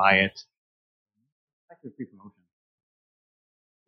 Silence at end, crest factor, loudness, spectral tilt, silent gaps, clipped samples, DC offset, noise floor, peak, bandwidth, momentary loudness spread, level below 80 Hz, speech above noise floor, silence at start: 1.6 s; 28 dB; -22 LUFS; -5.5 dB/octave; 0.58-1.06 s, 1.32-1.68 s; under 0.1%; under 0.1%; under -90 dBFS; -4 dBFS; 6.2 kHz; 26 LU; -74 dBFS; over 65 dB; 0 s